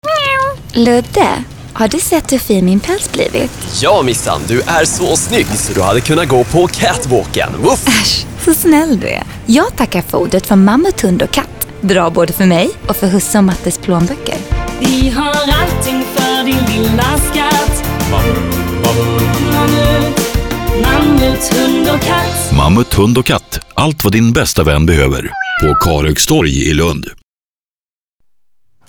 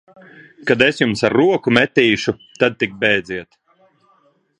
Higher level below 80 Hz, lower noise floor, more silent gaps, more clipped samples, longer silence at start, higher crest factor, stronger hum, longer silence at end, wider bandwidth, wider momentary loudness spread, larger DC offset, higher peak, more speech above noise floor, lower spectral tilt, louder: first, -24 dBFS vs -54 dBFS; first, under -90 dBFS vs -58 dBFS; neither; neither; second, 0.05 s vs 0.65 s; second, 12 dB vs 18 dB; neither; first, 1.75 s vs 1.15 s; first, over 20 kHz vs 10.5 kHz; second, 6 LU vs 10 LU; neither; about the same, 0 dBFS vs 0 dBFS; first, over 79 dB vs 41 dB; about the same, -4.5 dB/octave vs -5 dB/octave; first, -12 LUFS vs -16 LUFS